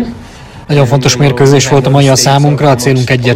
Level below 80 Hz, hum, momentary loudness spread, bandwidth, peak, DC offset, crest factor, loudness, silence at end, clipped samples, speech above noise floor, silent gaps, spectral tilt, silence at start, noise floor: -36 dBFS; none; 5 LU; 15 kHz; 0 dBFS; under 0.1%; 8 dB; -8 LUFS; 0 s; 2%; 22 dB; none; -5 dB/octave; 0 s; -30 dBFS